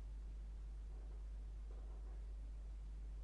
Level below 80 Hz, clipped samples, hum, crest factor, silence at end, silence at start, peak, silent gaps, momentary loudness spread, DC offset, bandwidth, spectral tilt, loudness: -50 dBFS; under 0.1%; none; 6 dB; 0 s; 0 s; -42 dBFS; none; 1 LU; under 0.1%; 6.6 kHz; -7 dB/octave; -54 LUFS